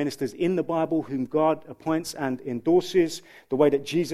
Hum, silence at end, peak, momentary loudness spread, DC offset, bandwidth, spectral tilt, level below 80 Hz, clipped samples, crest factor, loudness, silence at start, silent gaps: none; 0 s; -8 dBFS; 8 LU; under 0.1%; 15 kHz; -6 dB/octave; -62 dBFS; under 0.1%; 18 dB; -25 LUFS; 0 s; none